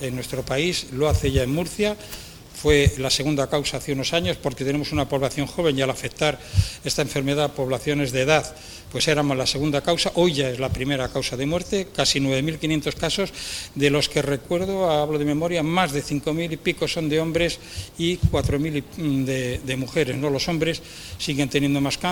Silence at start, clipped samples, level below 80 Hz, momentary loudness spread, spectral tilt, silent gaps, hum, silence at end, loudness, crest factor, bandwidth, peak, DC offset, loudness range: 0 s; under 0.1%; -40 dBFS; 6 LU; -4.5 dB/octave; none; none; 0 s; -23 LUFS; 22 dB; over 20 kHz; -2 dBFS; under 0.1%; 2 LU